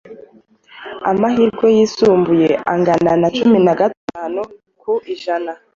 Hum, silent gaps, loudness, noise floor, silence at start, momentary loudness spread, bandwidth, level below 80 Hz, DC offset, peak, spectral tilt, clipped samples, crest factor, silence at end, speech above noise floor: none; 3.97-4.08 s; -15 LUFS; -48 dBFS; 0.1 s; 13 LU; 7.4 kHz; -54 dBFS; under 0.1%; -2 dBFS; -6.5 dB/octave; under 0.1%; 14 dB; 0.2 s; 33 dB